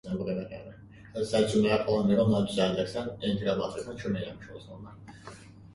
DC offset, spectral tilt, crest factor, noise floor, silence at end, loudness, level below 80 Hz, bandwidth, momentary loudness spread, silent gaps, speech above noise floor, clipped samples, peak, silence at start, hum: under 0.1%; -6.5 dB/octave; 18 dB; -49 dBFS; 0 s; -29 LUFS; -56 dBFS; 11.5 kHz; 22 LU; none; 20 dB; under 0.1%; -12 dBFS; 0.05 s; none